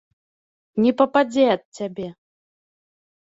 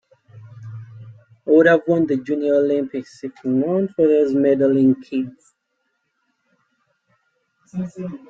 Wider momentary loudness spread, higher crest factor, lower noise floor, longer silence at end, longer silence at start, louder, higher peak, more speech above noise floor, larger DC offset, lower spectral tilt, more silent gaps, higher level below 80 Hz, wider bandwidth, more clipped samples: second, 15 LU vs 21 LU; about the same, 20 dB vs 18 dB; first, under -90 dBFS vs -72 dBFS; first, 1.15 s vs 0.15 s; first, 0.75 s vs 0.35 s; about the same, -20 LUFS vs -18 LUFS; about the same, -2 dBFS vs -2 dBFS; first, over 70 dB vs 54 dB; neither; second, -6 dB/octave vs -8.5 dB/octave; first, 1.65-1.72 s vs none; about the same, -66 dBFS vs -64 dBFS; about the same, 7.8 kHz vs 7.6 kHz; neither